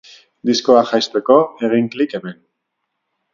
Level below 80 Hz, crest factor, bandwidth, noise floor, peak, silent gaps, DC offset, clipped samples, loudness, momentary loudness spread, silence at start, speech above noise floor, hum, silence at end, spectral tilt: -64 dBFS; 18 dB; 7.4 kHz; -75 dBFS; 0 dBFS; none; under 0.1%; under 0.1%; -16 LUFS; 11 LU; 0.45 s; 59 dB; none; 1 s; -4.5 dB/octave